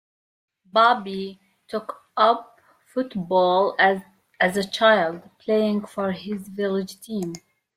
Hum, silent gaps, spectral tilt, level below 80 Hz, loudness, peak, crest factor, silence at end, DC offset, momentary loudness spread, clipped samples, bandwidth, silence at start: none; none; -5 dB/octave; -68 dBFS; -22 LUFS; -4 dBFS; 20 dB; 0.4 s; under 0.1%; 14 LU; under 0.1%; 16 kHz; 0.75 s